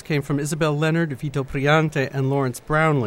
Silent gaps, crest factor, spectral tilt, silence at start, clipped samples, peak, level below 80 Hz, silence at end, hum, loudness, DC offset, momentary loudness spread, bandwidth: none; 16 dB; -6 dB/octave; 0.05 s; under 0.1%; -6 dBFS; -46 dBFS; 0 s; none; -22 LUFS; under 0.1%; 6 LU; 15.5 kHz